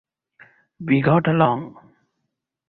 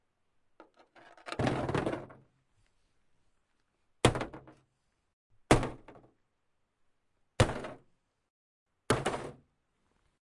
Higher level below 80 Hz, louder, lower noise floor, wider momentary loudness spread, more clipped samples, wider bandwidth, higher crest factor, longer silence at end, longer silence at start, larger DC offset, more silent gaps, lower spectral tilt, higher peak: second, -58 dBFS vs -50 dBFS; first, -19 LUFS vs -32 LUFS; about the same, -78 dBFS vs -77 dBFS; about the same, 18 LU vs 20 LU; neither; second, 4.4 kHz vs 11.5 kHz; second, 20 dB vs 30 dB; about the same, 1 s vs 0.95 s; second, 0.8 s vs 1.25 s; neither; second, none vs 5.13-5.30 s, 8.30-8.66 s; first, -11 dB/octave vs -5 dB/octave; first, -2 dBFS vs -8 dBFS